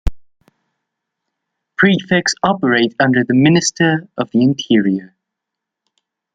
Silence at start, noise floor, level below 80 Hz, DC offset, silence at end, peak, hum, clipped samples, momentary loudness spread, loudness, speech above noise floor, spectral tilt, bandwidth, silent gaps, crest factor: 0.05 s; -81 dBFS; -34 dBFS; under 0.1%; 1.3 s; 0 dBFS; none; under 0.1%; 8 LU; -14 LUFS; 67 dB; -5 dB/octave; 9.4 kHz; none; 16 dB